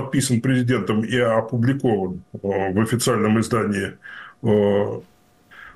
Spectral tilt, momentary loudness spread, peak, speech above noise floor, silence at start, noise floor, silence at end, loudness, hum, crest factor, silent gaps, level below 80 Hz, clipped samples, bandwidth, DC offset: -6 dB/octave; 11 LU; -8 dBFS; 29 dB; 0 s; -49 dBFS; 0.05 s; -21 LUFS; none; 14 dB; none; -54 dBFS; under 0.1%; 12.5 kHz; under 0.1%